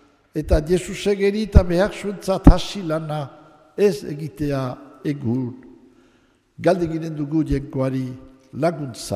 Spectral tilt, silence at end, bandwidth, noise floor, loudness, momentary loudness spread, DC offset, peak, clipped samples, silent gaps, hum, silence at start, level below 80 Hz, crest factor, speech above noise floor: -7 dB/octave; 0 s; 15 kHz; -59 dBFS; -22 LUFS; 14 LU; under 0.1%; 0 dBFS; under 0.1%; none; none; 0.35 s; -26 dBFS; 20 dB; 39 dB